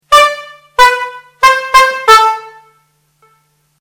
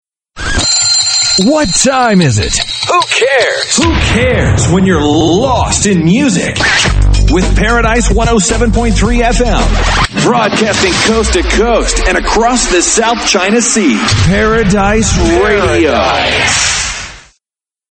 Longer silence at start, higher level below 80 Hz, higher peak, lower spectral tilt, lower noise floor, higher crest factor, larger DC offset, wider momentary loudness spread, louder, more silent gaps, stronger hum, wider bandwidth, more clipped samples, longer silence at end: second, 0.1 s vs 0.35 s; second, -42 dBFS vs -18 dBFS; about the same, 0 dBFS vs 0 dBFS; second, 1 dB/octave vs -3.5 dB/octave; second, -56 dBFS vs under -90 dBFS; about the same, 12 dB vs 10 dB; neither; first, 15 LU vs 3 LU; about the same, -8 LUFS vs -9 LUFS; neither; neither; first, over 20 kHz vs 9.2 kHz; first, 4% vs under 0.1%; first, 1.3 s vs 0.7 s